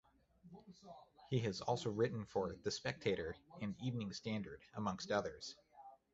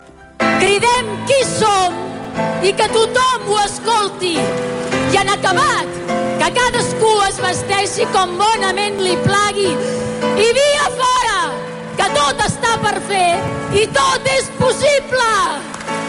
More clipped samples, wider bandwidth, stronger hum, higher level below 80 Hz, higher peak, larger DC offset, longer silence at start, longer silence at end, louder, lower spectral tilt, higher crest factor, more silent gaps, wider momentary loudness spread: neither; second, 8 kHz vs 11.5 kHz; neither; second, -68 dBFS vs -42 dBFS; second, -22 dBFS vs -2 dBFS; neither; first, 0.45 s vs 0.2 s; first, 0.2 s vs 0 s; second, -42 LUFS vs -15 LUFS; first, -5 dB/octave vs -3 dB/octave; first, 22 dB vs 14 dB; neither; first, 20 LU vs 6 LU